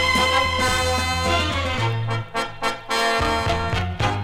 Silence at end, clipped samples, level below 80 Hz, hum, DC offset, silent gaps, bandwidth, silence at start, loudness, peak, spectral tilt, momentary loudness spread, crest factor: 0 s; under 0.1%; -34 dBFS; none; under 0.1%; none; 16.5 kHz; 0 s; -21 LUFS; -4 dBFS; -4 dB/octave; 7 LU; 16 dB